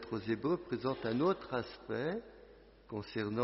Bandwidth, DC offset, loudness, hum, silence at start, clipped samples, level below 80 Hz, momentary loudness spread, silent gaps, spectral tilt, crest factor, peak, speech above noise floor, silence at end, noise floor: 5.8 kHz; under 0.1%; -37 LUFS; none; 0 s; under 0.1%; -64 dBFS; 11 LU; none; -5.5 dB/octave; 18 dB; -20 dBFS; 23 dB; 0 s; -59 dBFS